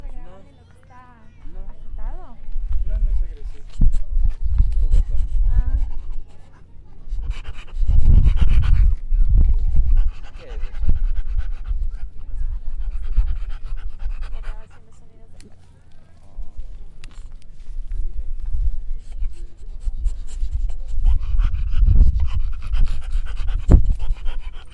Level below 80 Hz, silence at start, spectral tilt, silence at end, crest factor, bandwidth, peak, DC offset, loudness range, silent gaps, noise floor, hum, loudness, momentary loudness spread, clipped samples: -20 dBFS; 0 s; -8 dB/octave; 0.05 s; 16 dB; 3.4 kHz; 0 dBFS; under 0.1%; 16 LU; none; -45 dBFS; none; -24 LUFS; 22 LU; under 0.1%